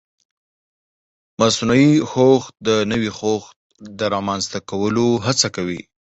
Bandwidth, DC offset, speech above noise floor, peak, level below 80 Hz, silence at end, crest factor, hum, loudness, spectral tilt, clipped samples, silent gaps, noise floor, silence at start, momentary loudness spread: 8.2 kHz; under 0.1%; over 72 dB; 0 dBFS; -52 dBFS; 0.3 s; 18 dB; none; -18 LUFS; -4.5 dB/octave; under 0.1%; 3.56-3.70 s; under -90 dBFS; 1.4 s; 11 LU